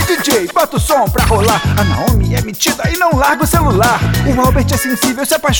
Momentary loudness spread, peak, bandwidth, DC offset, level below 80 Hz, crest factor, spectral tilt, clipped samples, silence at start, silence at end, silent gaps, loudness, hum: 3 LU; 0 dBFS; over 20 kHz; under 0.1%; -22 dBFS; 12 dB; -4.5 dB/octave; under 0.1%; 0 s; 0 s; none; -12 LUFS; none